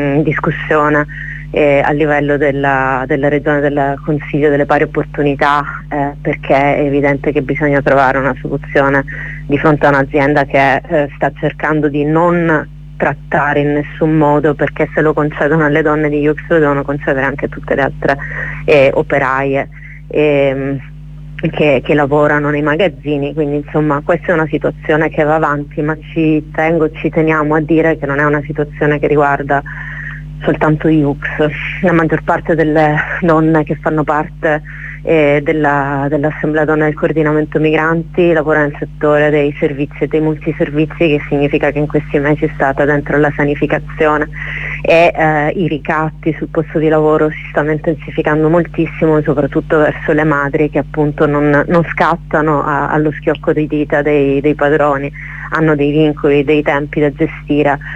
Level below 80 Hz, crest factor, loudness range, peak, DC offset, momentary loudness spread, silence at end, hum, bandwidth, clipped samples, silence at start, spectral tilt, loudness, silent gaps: -32 dBFS; 12 dB; 2 LU; 0 dBFS; under 0.1%; 7 LU; 0 s; none; 7.8 kHz; under 0.1%; 0 s; -8.5 dB/octave; -13 LUFS; none